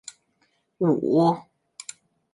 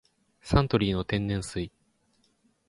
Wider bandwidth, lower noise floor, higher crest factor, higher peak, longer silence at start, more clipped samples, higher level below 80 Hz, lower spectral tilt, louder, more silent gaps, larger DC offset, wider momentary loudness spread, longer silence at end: about the same, 11.5 kHz vs 11.5 kHz; about the same, -69 dBFS vs -69 dBFS; about the same, 18 dB vs 22 dB; about the same, -8 dBFS vs -8 dBFS; first, 0.8 s vs 0.45 s; neither; second, -70 dBFS vs -42 dBFS; about the same, -7 dB/octave vs -6.5 dB/octave; first, -23 LUFS vs -28 LUFS; neither; neither; first, 20 LU vs 14 LU; about the same, 0.9 s vs 1 s